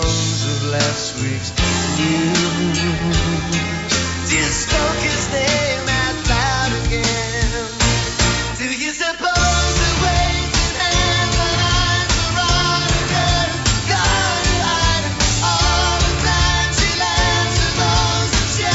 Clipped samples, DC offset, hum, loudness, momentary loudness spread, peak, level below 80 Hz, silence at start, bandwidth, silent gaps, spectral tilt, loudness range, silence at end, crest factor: under 0.1%; under 0.1%; none; -17 LUFS; 4 LU; -4 dBFS; -26 dBFS; 0 s; 8.2 kHz; none; -3 dB/octave; 2 LU; 0 s; 14 dB